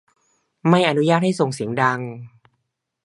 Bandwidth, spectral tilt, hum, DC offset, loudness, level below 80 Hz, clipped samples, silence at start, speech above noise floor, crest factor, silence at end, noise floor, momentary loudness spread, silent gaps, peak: 11.5 kHz; -6 dB/octave; none; under 0.1%; -19 LUFS; -66 dBFS; under 0.1%; 0.65 s; 56 dB; 20 dB; 0.75 s; -75 dBFS; 13 LU; none; 0 dBFS